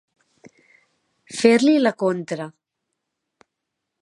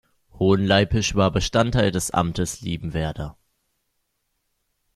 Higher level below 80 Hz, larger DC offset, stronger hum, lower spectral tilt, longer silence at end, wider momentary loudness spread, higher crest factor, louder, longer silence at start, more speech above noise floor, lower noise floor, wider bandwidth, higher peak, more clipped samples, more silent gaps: second, -74 dBFS vs -40 dBFS; neither; neither; about the same, -5 dB/octave vs -5 dB/octave; second, 1.5 s vs 1.65 s; first, 17 LU vs 11 LU; about the same, 22 dB vs 20 dB; first, -19 LUFS vs -22 LUFS; first, 1.3 s vs 0.35 s; first, 63 dB vs 53 dB; first, -81 dBFS vs -74 dBFS; second, 11.5 kHz vs 14 kHz; about the same, -2 dBFS vs -2 dBFS; neither; neither